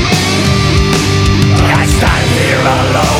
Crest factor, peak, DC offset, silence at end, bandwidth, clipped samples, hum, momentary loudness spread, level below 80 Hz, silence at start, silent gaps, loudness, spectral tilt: 10 dB; 0 dBFS; under 0.1%; 0 s; 16.5 kHz; under 0.1%; none; 1 LU; -20 dBFS; 0 s; none; -10 LUFS; -5 dB/octave